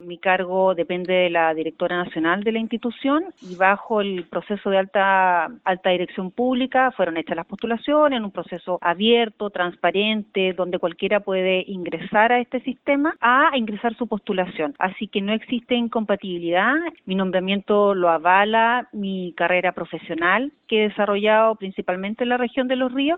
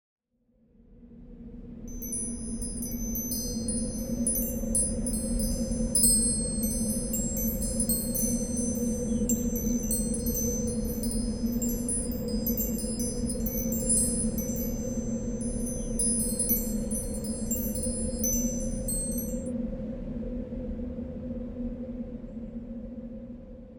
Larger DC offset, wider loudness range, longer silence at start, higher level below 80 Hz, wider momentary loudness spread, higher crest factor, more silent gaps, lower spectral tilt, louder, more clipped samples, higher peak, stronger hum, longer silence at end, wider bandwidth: second, under 0.1% vs 0.3%; second, 3 LU vs 9 LU; second, 0 s vs 0.15 s; second, -62 dBFS vs -38 dBFS; second, 9 LU vs 12 LU; about the same, 18 dB vs 22 dB; neither; first, -8 dB/octave vs -4.5 dB/octave; first, -21 LUFS vs -29 LUFS; neither; first, -2 dBFS vs -8 dBFS; neither; about the same, 0 s vs 0 s; second, 4.7 kHz vs over 20 kHz